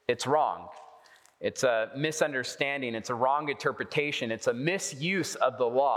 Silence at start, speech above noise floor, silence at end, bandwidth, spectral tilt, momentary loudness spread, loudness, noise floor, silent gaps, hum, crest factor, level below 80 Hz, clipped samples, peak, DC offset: 0.1 s; 28 dB; 0 s; 16 kHz; -4 dB/octave; 6 LU; -29 LUFS; -57 dBFS; none; none; 20 dB; -76 dBFS; under 0.1%; -10 dBFS; under 0.1%